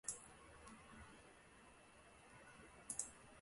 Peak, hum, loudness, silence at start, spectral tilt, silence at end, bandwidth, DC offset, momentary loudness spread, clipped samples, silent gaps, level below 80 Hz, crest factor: -26 dBFS; none; -55 LUFS; 0.05 s; -1.5 dB/octave; 0 s; 11.5 kHz; under 0.1%; 17 LU; under 0.1%; none; -74 dBFS; 30 dB